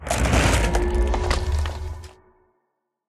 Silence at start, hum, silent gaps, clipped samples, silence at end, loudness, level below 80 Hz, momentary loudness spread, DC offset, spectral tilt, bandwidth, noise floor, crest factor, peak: 0 s; none; none; under 0.1%; 1 s; -22 LUFS; -26 dBFS; 15 LU; under 0.1%; -5 dB/octave; 13.5 kHz; -76 dBFS; 18 dB; -6 dBFS